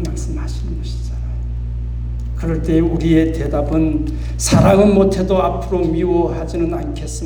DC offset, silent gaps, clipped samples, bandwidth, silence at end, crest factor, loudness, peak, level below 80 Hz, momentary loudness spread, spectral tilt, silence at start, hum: under 0.1%; none; under 0.1%; 19.5 kHz; 0 s; 16 dB; -17 LUFS; -2 dBFS; -24 dBFS; 13 LU; -6.5 dB/octave; 0 s; 60 Hz at -45 dBFS